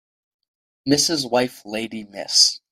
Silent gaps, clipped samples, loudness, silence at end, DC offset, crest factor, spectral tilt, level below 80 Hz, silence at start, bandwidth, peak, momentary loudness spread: none; under 0.1%; -19 LUFS; 0.15 s; under 0.1%; 20 dB; -2 dB/octave; -62 dBFS; 0.85 s; 16 kHz; -2 dBFS; 17 LU